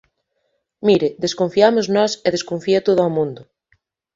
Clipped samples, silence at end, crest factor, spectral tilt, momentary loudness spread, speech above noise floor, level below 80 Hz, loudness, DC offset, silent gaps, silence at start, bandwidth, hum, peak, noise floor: under 0.1%; 0.7 s; 18 dB; -5 dB/octave; 8 LU; 54 dB; -60 dBFS; -18 LUFS; under 0.1%; none; 0.8 s; 7.8 kHz; none; 0 dBFS; -70 dBFS